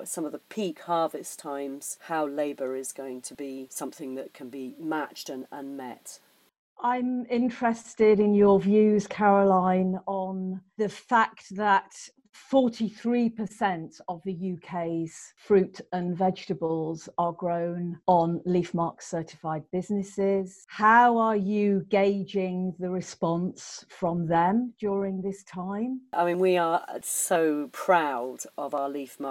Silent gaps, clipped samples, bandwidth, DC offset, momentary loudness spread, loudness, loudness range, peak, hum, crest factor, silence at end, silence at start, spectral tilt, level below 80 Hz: 6.59-6.76 s; under 0.1%; 16.5 kHz; under 0.1%; 16 LU; -27 LUFS; 11 LU; -8 dBFS; none; 20 dB; 0 s; 0 s; -5.5 dB/octave; -68 dBFS